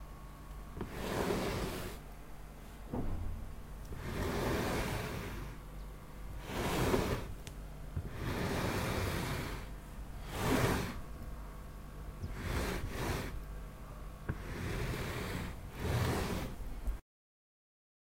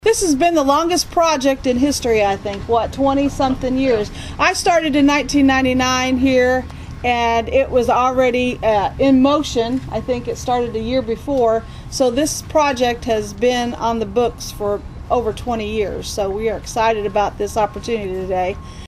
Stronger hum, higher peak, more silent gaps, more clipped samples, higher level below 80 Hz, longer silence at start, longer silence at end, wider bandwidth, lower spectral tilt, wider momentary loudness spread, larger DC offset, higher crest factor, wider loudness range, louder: neither; second, -16 dBFS vs -2 dBFS; neither; neither; second, -44 dBFS vs -36 dBFS; about the same, 0 s vs 0.05 s; first, 1 s vs 0 s; about the same, 16 kHz vs 15 kHz; about the same, -5.5 dB/octave vs -4.5 dB/octave; first, 15 LU vs 8 LU; neither; first, 22 dB vs 16 dB; about the same, 4 LU vs 5 LU; second, -39 LUFS vs -17 LUFS